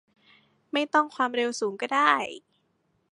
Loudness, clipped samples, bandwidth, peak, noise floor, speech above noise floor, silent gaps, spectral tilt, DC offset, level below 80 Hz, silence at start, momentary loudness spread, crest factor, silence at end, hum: -26 LUFS; under 0.1%; 11.5 kHz; -6 dBFS; -72 dBFS; 46 dB; none; -2.5 dB/octave; under 0.1%; -82 dBFS; 0.75 s; 10 LU; 22 dB; 0.75 s; none